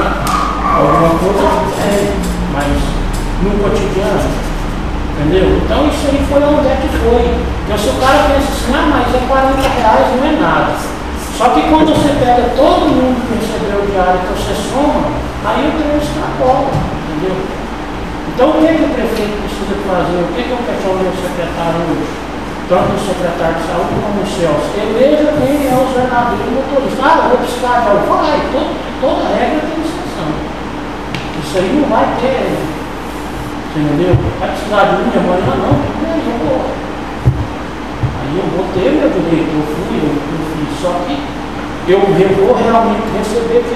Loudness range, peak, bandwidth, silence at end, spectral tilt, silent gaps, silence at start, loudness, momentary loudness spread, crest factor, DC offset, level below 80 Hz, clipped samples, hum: 4 LU; 0 dBFS; 15 kHz; 0 s; -6 dB/octave; none; 0 s; -13 LUFS; 10 LU; 12 dB; 2%; -24 dBFS; under 0.1%; none